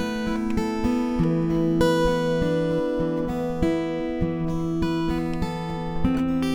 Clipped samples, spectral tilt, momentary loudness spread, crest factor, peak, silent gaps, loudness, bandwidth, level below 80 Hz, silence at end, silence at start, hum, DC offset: under 0.1%; -7 dB/octave; 6 LU; 16 dB; -8 dBFS; none; -24 LUFS; 14.5 kHz; -36 dBFS; 0 s; 0 s; none; under 0.1%